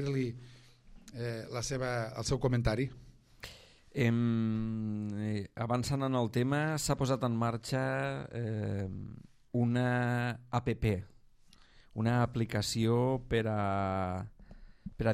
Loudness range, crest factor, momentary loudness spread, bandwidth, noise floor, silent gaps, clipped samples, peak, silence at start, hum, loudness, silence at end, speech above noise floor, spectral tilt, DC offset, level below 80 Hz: 2 LU; 18 dB; 12 LU; 15 kHz; -60 dBFS; none; under 0.1%; -14 dBFS; 0 s; none; -33 LUFS; 0 s; 27 dB; -6 dB/octave; under 0.1%; -52 dBFS